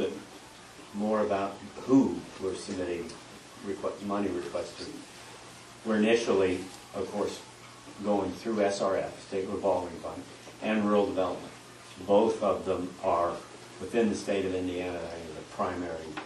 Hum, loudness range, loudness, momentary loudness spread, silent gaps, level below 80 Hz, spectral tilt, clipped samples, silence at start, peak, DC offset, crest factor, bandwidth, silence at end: none; 3 LU; -30 LUFS; 21 LU; none; -64 dBFS; -5.5 dB/octave; under 0.1%; 0 s; -12 dBFS; under 0.1%; 18 dB; 12.5 kHz; 0 s